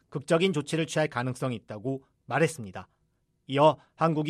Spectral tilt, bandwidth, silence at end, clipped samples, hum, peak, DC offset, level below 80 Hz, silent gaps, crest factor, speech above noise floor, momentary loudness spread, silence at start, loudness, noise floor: -5.5 dB/octave; 13.5 kHz; 0 s; under 0.1%; none; -8 dBFS; under 0.1%; -70 dBFS; none; 20 dB; 46 dB; 14 LU; 0.1 s; -28 LUFS; -73 dBFS